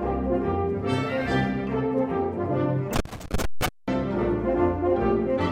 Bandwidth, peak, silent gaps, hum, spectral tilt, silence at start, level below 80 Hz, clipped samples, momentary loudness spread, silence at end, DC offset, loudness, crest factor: 16 kHz; -10 dBFS; none; none; -6.5 dB/octave; 0 s; -38 dBFS; under 0.1%; 6 LU; 0 s; under 0.1%; -26 LUFS; 14 dB